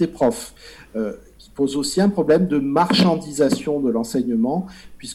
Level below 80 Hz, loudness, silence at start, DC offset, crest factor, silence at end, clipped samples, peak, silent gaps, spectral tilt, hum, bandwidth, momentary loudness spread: -50 dBFS; -20 LUFS; 0 s; under 0.1%; 14 dB; 0 s; under 0.1%; -6 dBFS; none; -5.5 dB/octave; none; 13.5 kHz; 17 LU